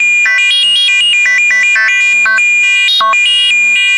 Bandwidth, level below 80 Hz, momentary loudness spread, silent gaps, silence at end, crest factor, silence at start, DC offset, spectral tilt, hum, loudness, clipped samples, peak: 11.5 kHz; -66 dBFS; 1 LU; none; 0 s; 4 dB; 0 s; under 0.1%; 4 dB/octave; none; -6 LUFS; under 0.1%; -4 dBFS